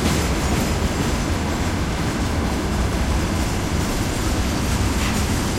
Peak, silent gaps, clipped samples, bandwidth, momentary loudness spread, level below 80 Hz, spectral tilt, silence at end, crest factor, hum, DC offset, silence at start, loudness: -8 dBFS; none; under 0.1%; 16 kHz; 2 LU; -26 dBFS; -5 dB/octave; 0 s; 14 dB; none; under 0.1%; 0 s; -22 LUFS